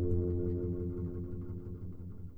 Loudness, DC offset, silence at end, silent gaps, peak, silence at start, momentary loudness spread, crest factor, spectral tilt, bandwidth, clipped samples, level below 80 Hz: -38 LUFS; under 0.1%; 0 s; none; -20 dBFS; 0 s; 12 LU; 16 dB; -13 dB/octave; 1.7 kHz; under 0.1%; -48 dBFS